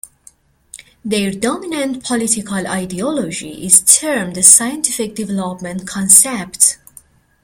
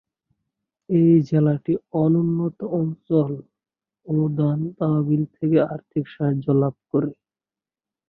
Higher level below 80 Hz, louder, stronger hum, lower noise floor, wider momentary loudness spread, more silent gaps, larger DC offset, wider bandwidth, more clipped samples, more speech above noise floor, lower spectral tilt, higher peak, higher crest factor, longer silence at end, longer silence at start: first, -52 dBFS vs -62 dBFS; first, -13 LUFS vs -22 LUFS; neither; second, -48 dBFS vs under -90 dBFS; first, 16 LU vs 8 LU; neither; neither; first, over 20 kHz vs 4.9 kHz; first, 0.4% vs under 0.1%; second, 33 dB vs over 69 dB; second, -2 dB/octave vs -11.5 dB/octave; first, 0 dBFS vs -6 dBFS; about the same, 16 dB vs 16 dB; second, 0.7 s vs 0.95 s; second, 0.75 s vs 0.9 s